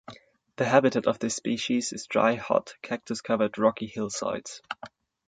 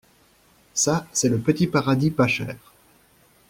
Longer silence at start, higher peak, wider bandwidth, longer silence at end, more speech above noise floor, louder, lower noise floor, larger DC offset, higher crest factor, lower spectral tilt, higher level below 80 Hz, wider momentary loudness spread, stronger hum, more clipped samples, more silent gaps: second, 0.1 s vs 0.75 s; about the same, -6 dBFS vs -4 dBFS; second, 9.4 kHz vs 16.5 kHz; second, 0.4 s vs 0.95 s; second, 23 dB vs 36 dB; second, -27 LUFS vs -22 LUFS; second, -49 dBFS vs -58 dBFS; neither; about the same, 22 dB vs 20 dB; about the same, -4.5 dB/octave vs -4.5 dB/octave; second, -66 dBFS vs -54 dBFS; first, 15 LU vs 9 LU; neither; neither; neither